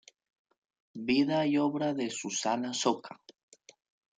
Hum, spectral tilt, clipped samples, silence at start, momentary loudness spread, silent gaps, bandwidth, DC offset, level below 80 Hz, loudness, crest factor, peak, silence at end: none; -4 dB/octave; under 0.1%; 0.95 s; 11 LU; none; 9.6 kHz; under 0.1%; -76 dBFS; -30 LUFS; 20 dB; -14 dBFS; 0.85 s